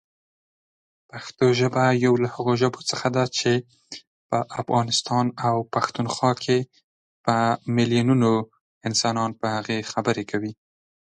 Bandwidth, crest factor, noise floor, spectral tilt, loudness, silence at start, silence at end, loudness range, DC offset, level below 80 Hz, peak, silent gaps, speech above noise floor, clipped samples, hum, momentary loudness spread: 10.5 kHz; 18 dB; under -90 dBFS; -5 dB/octave; -23 LUFS; 1.15 s; 0.65 s; 2 LU; under 0.1%; -62 dBFS; -6 dBFS; 4.07-4.30 s, 6.84-7.24 s, 8.61-8.81 s; over 67 dB; under 0.1%; none; 15 LU